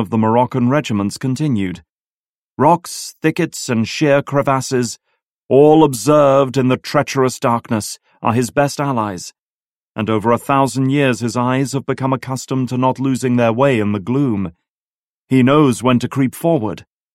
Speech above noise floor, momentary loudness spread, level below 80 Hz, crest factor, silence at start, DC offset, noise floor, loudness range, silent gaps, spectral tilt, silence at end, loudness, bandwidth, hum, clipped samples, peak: over 75 dB; 10 LU; -54 dBFS; 16 dB; 0 s; under 0.1%; under -90 dBFS; 4 LU; 1.90-2.57 s, 5.25-5.49 s, 9.39-9.95 s, 14.70-15.28 s; -6 dB/octave; 0.3 s; -16 LUFS; 16 kHz; none; under 0.1%; 0 dBFS